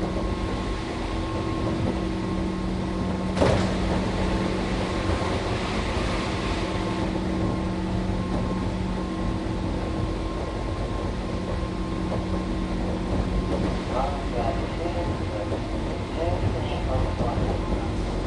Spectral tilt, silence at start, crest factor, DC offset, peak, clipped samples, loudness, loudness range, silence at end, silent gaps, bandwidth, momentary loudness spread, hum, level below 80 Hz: -6.5 dB/octave; 0 s; 20 dB; under 0.1%; -6 dBFS; under 0.1%; -27 LUFS; 3 LU; 0 s; none; 11.5 kHz; 4 LU; none; -32 dBFS